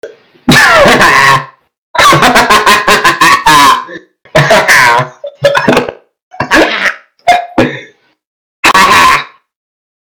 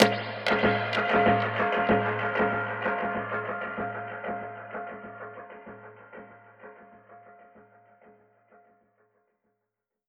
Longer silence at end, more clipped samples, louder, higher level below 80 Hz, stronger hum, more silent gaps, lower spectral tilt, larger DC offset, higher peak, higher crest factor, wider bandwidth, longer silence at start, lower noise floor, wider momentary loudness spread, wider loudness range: second, 0.8 s vs 2.5 s; first, 3% vs under 0.1%; first, -6 LUFS vs -27 LUFS; first, -36 dBFS vs -60 dBFS; neither; first, 1.78-1.94 s, 6.22-6.31 s, 8.26-8.63 s vs none; second, -3 dB/octave vs -5.5 dB/octave; neither; first, 0 dBFS vs -4 dBFS; second, 8 dB vs 26 dB; first, over 20 kHz vs 11.5 kHz; about the same, 0.05 s vs 0 s; second, -35 dBFS vs -85 dBFS; second, 11 LU vs 23 LU; second, 6 LU vs 22 LU